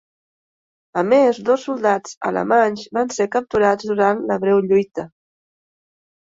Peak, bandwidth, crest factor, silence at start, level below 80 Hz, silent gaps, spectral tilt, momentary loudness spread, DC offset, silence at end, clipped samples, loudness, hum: -4 dBFS; 7.8 kHz; 16 dB; 0.95 s; -58 dBFS; 2.17-2.21 s; -5.5 dB/octave; 8 LU; under 0.1%; 1.3 s; under 0.1%; -18 LUFS; none